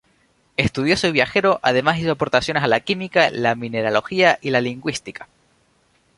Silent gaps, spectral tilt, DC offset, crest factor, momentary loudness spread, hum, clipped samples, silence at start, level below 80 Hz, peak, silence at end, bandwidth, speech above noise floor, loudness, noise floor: none; -5 dB/octave; under 0.1%; 18 dB; 10 LU; none; under 0.1%; 0.6 s; -48 dBFS; -2 dBFS; 0.95 s; 11.5 kHz; 42 dB; -19 LUFS; -61 dBFS